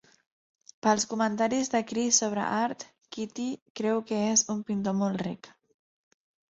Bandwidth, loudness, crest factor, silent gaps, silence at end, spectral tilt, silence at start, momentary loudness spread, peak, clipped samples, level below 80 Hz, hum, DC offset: 8.2 kHz; -28 LUFS; 20 dB; 3.62-3.75 s; 1 s; -3.5 dB/octave; 0.85 s; 13 LU; -8 dBFS; under 0.1%; -70 dBFS; none; under 0.1%